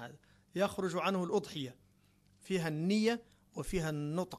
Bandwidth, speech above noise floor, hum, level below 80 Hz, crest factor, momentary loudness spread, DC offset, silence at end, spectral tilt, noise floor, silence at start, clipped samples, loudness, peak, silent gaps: 13 kHz; 34 dB; none; -58 dBFS; 18 dB; 13 LU; under 0.1%; 0 s; -5.5 dB/octave; -68 dBFS; 0 s; under 0.1%; -36 LUFS; -20 dBFS; none